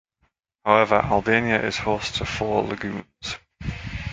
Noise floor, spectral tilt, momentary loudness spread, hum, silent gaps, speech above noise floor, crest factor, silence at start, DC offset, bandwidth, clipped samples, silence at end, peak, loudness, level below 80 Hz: -70 dBFS; -5 dB/octave; 14 LU; none; none; 48 dB; 22 dB; 0.65 s; under 0.1%; 9.4 kHz; under 0.1%; 0 s; -2 dBFS; -23 LUFS; -42 dBFS